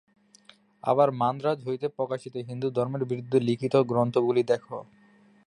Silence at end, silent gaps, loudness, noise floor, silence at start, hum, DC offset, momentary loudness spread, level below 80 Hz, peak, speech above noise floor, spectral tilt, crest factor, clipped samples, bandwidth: 0.6 s; none; -27 LUFS; -58 dBFS; 0.85 s; none; under 0.1%; 10 LU; -70 dBFS; -8 dBFS; 33 dB; -8 dB/octave; 18 dB; under 0.1%; 10.5 kHz